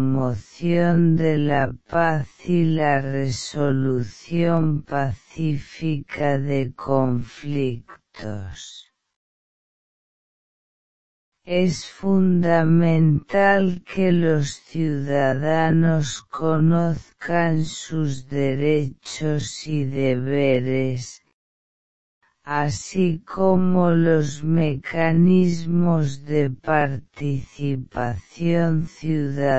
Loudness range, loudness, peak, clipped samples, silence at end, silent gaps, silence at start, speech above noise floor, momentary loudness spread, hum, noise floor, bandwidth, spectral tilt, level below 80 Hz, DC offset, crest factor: 7 LU; -21 LUFS; -4 dBFS; under 0.1%; 0 s; 9.16-11.32 s, 21.34-22.21 s; 0 s; over 69 dB; 10 LU; none; under -90 dBFS; 8.2 kHz; -7 dB/octave; -50 dBFS; 2%; 18 dB